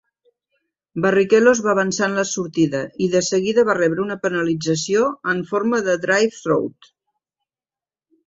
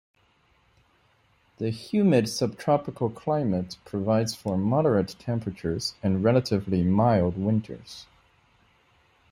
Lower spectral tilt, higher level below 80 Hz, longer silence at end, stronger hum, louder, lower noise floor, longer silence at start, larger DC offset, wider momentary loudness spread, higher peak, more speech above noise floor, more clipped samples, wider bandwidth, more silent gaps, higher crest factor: second, -4.5 dB/octave vs -7 dB/octave; about the same, -62 dBFS vs -58 dBFS; first, 1.55 s vs 1.3 s; neither; first, -19 LUFS vs -26 LUFS; first, under -90 dBFS vs -65 dBFS; second, 0.95 s vs 1.6 s; neither; second, 7 LU vs 10 LU; first, -2 dBFS vs -8 dBFS; first, over 72 dB vs 40 dB; neither; second, 8 kHz vs 15.5 kHz; neither; about the same, 18 dB vs 18 dB